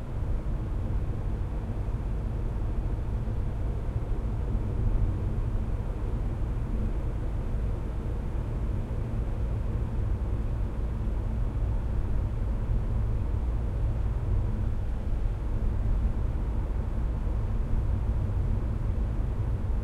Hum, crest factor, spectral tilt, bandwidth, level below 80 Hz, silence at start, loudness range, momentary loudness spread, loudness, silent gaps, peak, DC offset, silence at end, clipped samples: none; 12 dB; -9 dB/octave; 4.7 kHz; -30 dBFS; 0 s; 2 LU; 3 LU; -32 LUFS; none; -16 dBFS; under 0.1%; 0 s; under 0.1%